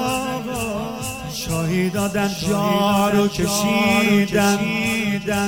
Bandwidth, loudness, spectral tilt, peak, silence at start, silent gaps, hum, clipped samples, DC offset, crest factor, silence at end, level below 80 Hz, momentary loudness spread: 17 kHz; -20 LUFS; -4.5 dB/octave; -6 dBFS; 0 s; none; none; under 0.1%; 0.2%; 14 dB; 0 s; -44 dBFS; 9 LU